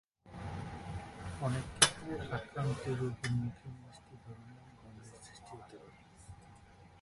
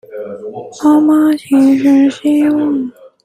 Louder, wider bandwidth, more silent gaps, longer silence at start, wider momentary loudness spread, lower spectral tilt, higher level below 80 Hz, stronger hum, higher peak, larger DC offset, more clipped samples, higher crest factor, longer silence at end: second, -36 LUFS vs -11 LUFS; second, 11.5 kHz vs 14 kHz; neither; first, 0.25 s vs 0.1 s; first, 26 LU vs 17 LU; second, -3 dB/octave vs -5.5 dB/octave; about the same, -58 dBFS vs -60 dBFS; neither; second, -6 dBFS vs -2 dBFS; neither; neither; first, 34 dB vs 10 dB; second, 0 s vs 0.35 s